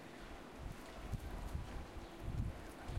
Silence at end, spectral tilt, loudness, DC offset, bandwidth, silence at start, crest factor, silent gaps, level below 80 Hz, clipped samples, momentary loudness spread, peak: 0 s; -6 dB/octave; -49 LUFS; under 0.1%; 16 kHz; 0 s; 18 dB; none; -50 dBFS; under 0.1%; 8 LU; -28 dBFS